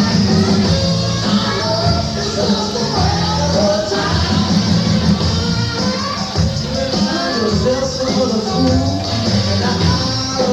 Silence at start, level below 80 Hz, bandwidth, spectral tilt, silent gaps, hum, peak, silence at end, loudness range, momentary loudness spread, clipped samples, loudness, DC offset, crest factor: 0 s; -32 dBFS; 12 kHz; -5 dB/octave; none; none; -2 dBFS; 0 s; 1 LU; 4 LU; under 0.1%; -16 LUFS; under 0.1%; 12 dB